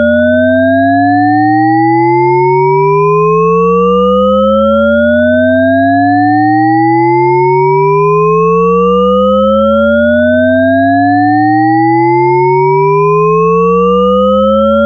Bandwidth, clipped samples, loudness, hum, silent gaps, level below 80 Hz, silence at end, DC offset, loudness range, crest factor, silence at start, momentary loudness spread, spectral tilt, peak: 6.6 kHz; under 0.1%; -8 LUFS; none; none; -36 dBFS; 0 s; under 0.1%; 0 LU; 8 dB; 0 s; 0 LU; -9 dB/octave; 0 dBFS